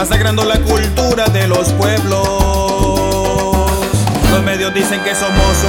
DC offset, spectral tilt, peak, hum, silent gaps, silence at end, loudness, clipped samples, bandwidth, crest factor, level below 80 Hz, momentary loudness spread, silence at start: under 0.1%; -4.5 dB/octave; 0 dBFS; none; none; 0 s; -13 LUFS; under 0.1%; 20 kHz; 12 dB; -20 dBFS; 2 LU; 0 s